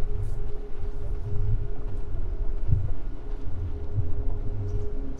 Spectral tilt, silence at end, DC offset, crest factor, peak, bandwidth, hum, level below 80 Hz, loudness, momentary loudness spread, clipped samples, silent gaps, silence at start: -9.5 dB/octave; 0 s; under 0.1%; 16 dB; -8 dBFS; 2.3 kHz; none; -28 dBFS; -33 LUFS; 9 LU; under 0.1%; none; 0 s